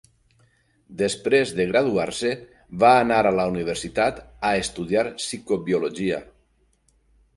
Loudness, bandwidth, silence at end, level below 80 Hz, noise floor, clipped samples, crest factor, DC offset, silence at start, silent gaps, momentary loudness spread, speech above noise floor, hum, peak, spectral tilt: -22 LUFS; 11.5 kHz; 1.15 s; -52 dBFS; -64 dBFS; under 0.1%; 20 dB; under 0.1%; 0.9 s; none; 10 LU; 42 dB; none; -4 dBFS; -4.5 dB/octave